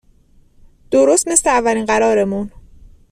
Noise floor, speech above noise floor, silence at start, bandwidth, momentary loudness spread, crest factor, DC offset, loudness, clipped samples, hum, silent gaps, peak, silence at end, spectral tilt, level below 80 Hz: -50 dBFS; 36 dB; 0.9 s; 15 kHz; 9 LU; 18 dB; under 0.1%; -15 LUFS; under 0.1%; none; none; 0 dBFS; 0.65 s; -3.5 dB/octave; -44 dBFS